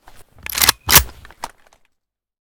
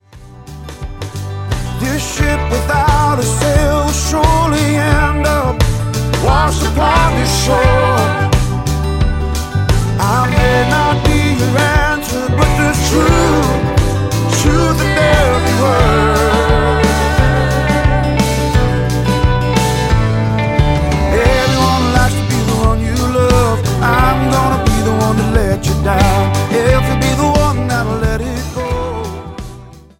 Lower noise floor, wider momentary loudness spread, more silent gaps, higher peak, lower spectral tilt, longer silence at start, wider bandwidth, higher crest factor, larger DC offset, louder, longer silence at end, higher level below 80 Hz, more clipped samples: first, -72 dBFS vs -35 dBFS; first, 24 LU vs 7 LU; neither; about the same, 0 dBFS vs 0 dBFS; second, -0.5 dB/octave vs -5.5 dB/octave; first, 0.5 s vs 0.15 s; first, over 20 kHz vs 17 kHz; first, 20 dB vs 12 dB; neither; about the same, -13 LUFS vs -13 LUFS; first, 1 s vs 0.2 s; second, -34 dBFS vs -20 dBFS; first, 0.2% vs under 0.1%